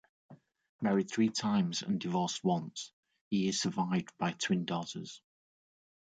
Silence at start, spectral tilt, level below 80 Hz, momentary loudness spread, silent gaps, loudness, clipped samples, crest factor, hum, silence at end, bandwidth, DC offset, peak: 0.3 s; -5 dB/octave; -74 dBFS; 13 LU; 0.69-0.79 s, 2.93-3.03 s, 3.21-3.31 s; -33 LUFS; under 0.1%; 16 dB; none; 0.95 s; 9.2 kHz; under 0.1%; -18 dBFS